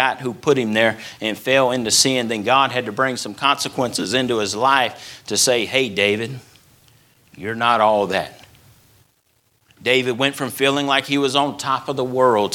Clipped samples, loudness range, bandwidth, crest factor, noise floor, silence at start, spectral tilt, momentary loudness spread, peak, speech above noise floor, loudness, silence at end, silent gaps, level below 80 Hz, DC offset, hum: under 0.1%; 4 LU; 18.5 kHz; 18 dB; -63 dBFS; 0 s; -3 dB/octave; 8 LU; 0 dBFS; 44 dB; -18 LUFS; 0 s; none; -60 dBFS; under 0.1%; none